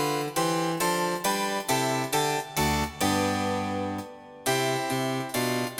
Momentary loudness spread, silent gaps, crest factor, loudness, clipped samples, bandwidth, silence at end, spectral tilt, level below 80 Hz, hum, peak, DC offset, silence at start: 4 LU; none; 16 dB; -27 LUFS; under 0.1%; 18 kHz; 0 s; -3.5 dB/octave; -50 dBFS; none; -12 dBFS; under 0.1%; 0 s